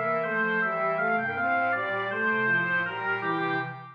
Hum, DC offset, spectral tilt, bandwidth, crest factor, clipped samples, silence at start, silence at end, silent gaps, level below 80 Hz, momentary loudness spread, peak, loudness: none; under 0.1%; -7.5 dB/octave; 6.2 kHz; 12 dB; under 0.1%; 0 s; 0 s; none; -84 dBFS; 5 LU; -16 dBFS; -26 LUFS